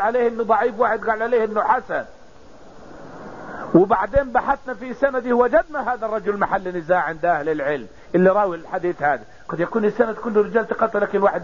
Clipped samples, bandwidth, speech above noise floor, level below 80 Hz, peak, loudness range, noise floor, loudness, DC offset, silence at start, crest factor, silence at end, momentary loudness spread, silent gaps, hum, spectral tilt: under 0.1%; 7.4 kHz; 26 dB; -46 dBFS; -4 dBFS; 2 LU; -46 dBFS; -20 LUFS; 0.6%; 0 s; 16 dB; 0 s; 11 LU; none; none; -8 dB/octave